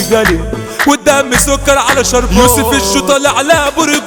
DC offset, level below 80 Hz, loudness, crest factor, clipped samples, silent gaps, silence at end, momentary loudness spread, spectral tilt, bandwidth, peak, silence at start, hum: under 0.1%; -24 dBFS; -10 LUFS; 10 dB; 0.2%; none; 0 s; 4 LU; -3 dB/octave; 20 kHz; 0 dBFS; 0 s; none